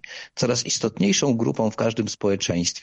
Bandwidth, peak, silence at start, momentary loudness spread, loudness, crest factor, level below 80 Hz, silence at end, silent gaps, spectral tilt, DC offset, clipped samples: 10.5 kHz; -8 dBFS; 0.05 s; 4 LU; -22 LUFS; 14 dB; -56 dBFS; 0 s; none; -4 dB/octave; under 0.1%; under 0.1%